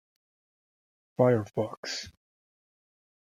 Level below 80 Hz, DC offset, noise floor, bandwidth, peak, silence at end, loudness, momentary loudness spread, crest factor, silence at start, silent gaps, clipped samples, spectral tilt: -70 dBFS; under 0.1%; under -90 dBFS; 14 kHz; -10 dBFS; 1.1 s; -29 LUFS; 18 LU; 24 dB; 1.2 s; 1.77-1.83 s; under 0.1%; -6 dB/octave